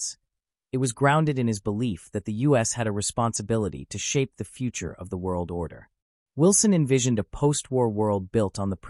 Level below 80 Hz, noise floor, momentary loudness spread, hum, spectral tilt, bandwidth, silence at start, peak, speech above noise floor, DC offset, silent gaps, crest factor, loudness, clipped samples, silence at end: -50 dBFS; -83 dBFS; 12 LU; none; -5 dB/octave; 13.5 kHz; 0 s; -8 dBFS; 58 dB; under 0.1%; 6.02-6.26 s; 18 dB; -25 LUFS; under 0.1%; 0 s